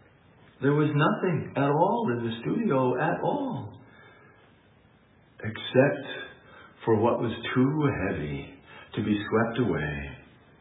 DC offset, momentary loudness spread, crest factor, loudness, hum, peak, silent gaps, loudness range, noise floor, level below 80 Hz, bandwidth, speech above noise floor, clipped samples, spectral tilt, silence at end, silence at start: under 0.1%; 14 LU; 22 dB; -27 LUFS; none; -6 dBFS; none; 5 LU; -59 dBFS; -56 dBFS; 4 kHz; 33 dB; under 0.1%; -11 dB/octave; 0.4 s; 0.6 s